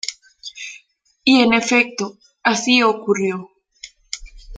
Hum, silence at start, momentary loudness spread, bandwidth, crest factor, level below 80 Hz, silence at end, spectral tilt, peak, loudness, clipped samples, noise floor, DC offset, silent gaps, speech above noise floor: none; 0.05 s; 19 LU; 9.4 kHz; 18 dB; -48 dBFS; 0 s; -3 dB/octave; -2 dBFS; -16 LUFS; under 0.1%; -52 dBFS; under 0.1%; none; 36 dB